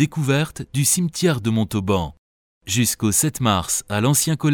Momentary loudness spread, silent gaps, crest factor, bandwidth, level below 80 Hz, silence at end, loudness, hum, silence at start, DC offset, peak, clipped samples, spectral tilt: 5 LU; 2.18-2.61 s; 16 dB; 19.5 kHz; -46 dBFS; 0 s; -20 LUFS; none; 0 s; under 0.1%; -4 dBFS; under 0.1%; -4 dB/octave